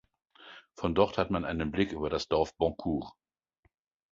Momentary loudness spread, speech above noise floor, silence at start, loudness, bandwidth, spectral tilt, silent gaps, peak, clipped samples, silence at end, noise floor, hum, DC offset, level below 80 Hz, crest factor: 21 LU; 43 dB; 0.4 s; -31 LUFS; 7.8 kHz; -6.5 dB/octave; none; -10 dBFS; under 0.1%; 1 s; -73 dBFS; none; under 0.1%; -50 dBFS; 22 dB